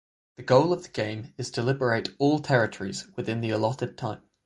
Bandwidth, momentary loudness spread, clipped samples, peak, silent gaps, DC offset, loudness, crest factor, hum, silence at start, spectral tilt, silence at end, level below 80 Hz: 11.5 kHz; 13 LU; under 0.1%; -6 dBFS; none; under 0.1%; -27 LUFS; 22 dB; none; 0.4 s; -6 dB/octave; 0.3 s; -62 dBFS